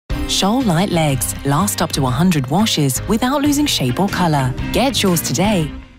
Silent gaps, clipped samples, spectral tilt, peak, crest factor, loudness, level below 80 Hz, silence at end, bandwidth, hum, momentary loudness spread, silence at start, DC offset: none; under 0.1%; -4.5 dB/octave; -4 dBFS; 12 dB; -16 LUFS; -32 dBFS; 0.15 s; 16.5 kHz; none; 3 LU; 0.1 s; under 0.1%